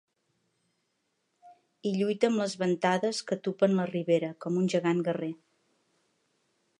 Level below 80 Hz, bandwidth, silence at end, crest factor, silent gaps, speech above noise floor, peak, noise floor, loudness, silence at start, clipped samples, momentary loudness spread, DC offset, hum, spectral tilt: -80 dBFS; 11 kHz; 1.45 s; 20 dB; none; 50 dB; -10 dBFS; -78 dBFS; -29 LUFS; 1.45 s; under 0.1%; 7 LU; under 0.1%; none; -6 dB/octave